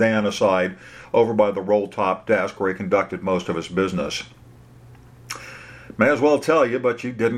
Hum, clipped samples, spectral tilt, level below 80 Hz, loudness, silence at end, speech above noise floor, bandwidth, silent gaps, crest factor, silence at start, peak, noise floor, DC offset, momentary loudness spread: none; under 0.1%; -5.5 dB/octave; -56 dBFS; -21 LUFS; 0 s; 26 dB; 14 kHz; none; 20 dB; 0 s; -2 dBFS; -46 dBFS; under 0.1%; 17 LU